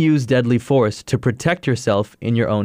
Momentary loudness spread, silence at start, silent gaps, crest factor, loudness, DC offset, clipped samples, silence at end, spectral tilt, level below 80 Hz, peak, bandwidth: 5 LU; 0 s; none; 12 dB; -19 LUFS; under 0.1%; under 0.1%; 0 s; -6.5 dB/octave; -50 dBFS; -6 dBFS; 15 kHz